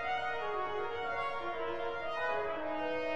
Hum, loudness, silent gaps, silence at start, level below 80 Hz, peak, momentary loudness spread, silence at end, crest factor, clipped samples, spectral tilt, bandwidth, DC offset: none; -36 LUFS; none; 0 s; -64 dBFS; -22 dBFS; 3 LU; 0 s; 14 dB; under 0.1%; -5 dB/octave; 8.8 kHz; 0.5%